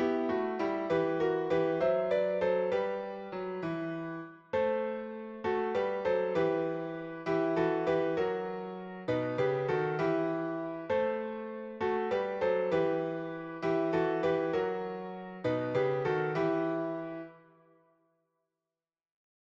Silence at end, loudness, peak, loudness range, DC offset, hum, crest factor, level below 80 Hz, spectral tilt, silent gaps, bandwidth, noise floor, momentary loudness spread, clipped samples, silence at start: 2.2 s; -32 LUFS; -18 dBFS; 3 LU; under 0.1%; none; 14 dB; -68 dBFS; -7.5 dB/octave; none; 7.2 kHz; under -90 dBFS; 10 LU; under 0.1%; 0 s